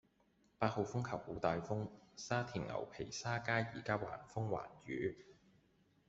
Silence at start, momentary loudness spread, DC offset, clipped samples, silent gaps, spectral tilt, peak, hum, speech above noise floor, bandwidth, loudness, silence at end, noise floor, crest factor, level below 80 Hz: 0.6 s; 8 LU; under 0.1%; under 0.1%; none; -5.5 dB/octave; -18 dBFS; none; 34 dB; 8 kHz; -41 LUFS; 0.75 s; -75 dBFS; 24 dB; -68 dBFS